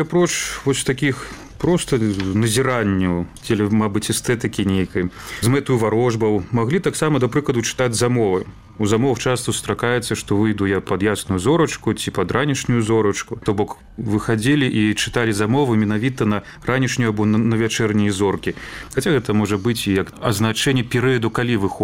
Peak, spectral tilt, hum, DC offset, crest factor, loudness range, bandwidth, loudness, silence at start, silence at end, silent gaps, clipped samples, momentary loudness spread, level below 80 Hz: -2 dBFS; -5.5 dB/octave; none; 0.2%; 16 dB; 1 LU; 16 kHz; -19 LUFS; 0 s; 0 s; none; under 0.1%; 5 LU; -44 dBFS